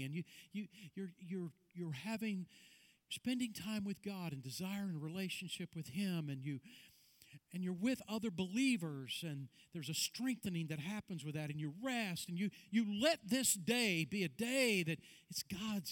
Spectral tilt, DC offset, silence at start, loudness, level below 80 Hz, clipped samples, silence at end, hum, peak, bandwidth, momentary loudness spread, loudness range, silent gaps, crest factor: -4 dB/octave; under 0.1%; 0 s; -41 LUFS; -78 dBFS; under 0.1%; 0 s; none; -20 dBFS; 19 kHz; 14 LU; 8 LU; none; 20 dB